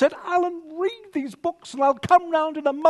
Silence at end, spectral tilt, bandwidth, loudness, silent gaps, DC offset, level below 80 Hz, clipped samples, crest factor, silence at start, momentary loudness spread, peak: 0 s; -5.5 dB/octave; 12 kHz; -23 LUFS; none; under 0.1%; -64 dBFS; under 0.1%; 18 dB; 0 s; 11 LU; -4 dBFS